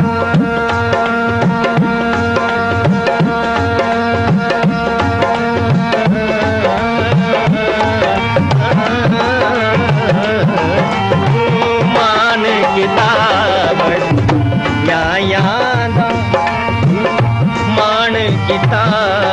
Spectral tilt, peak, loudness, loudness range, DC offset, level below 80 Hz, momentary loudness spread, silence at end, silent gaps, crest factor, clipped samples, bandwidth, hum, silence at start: -6.5 dB/octave; 0 dBFS; -13 LUFS; 2 LU; under 0.1%; -38 dBFS; 3 LU; 0 s; none; 12 dB; under 0.1%; 11 kHz; none; 0 s